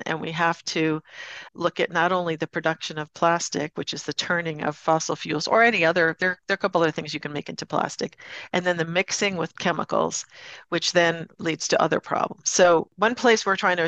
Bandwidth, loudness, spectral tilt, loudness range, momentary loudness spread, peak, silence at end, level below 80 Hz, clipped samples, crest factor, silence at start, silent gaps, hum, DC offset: 8.8 kHz; -23 LUFS; -3.5 dB/octave; 4 LU; 11 LU; -6 dBFS; 0 s; -68 dBFS; under 0.1%; 18 dB; 0 s; none; none; under 0.1%